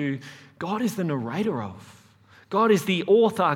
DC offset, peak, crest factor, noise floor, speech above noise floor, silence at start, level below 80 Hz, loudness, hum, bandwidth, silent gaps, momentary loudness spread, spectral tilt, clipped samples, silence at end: under 0.1%; -8 dBFS; 16 dB; -55 dBFS; 31 dB; 0 s; -70 dBFS; -24 LUFS; none; 17 kHz; none; 16 LU; -6 dB/octave; under 0.1%; 0 s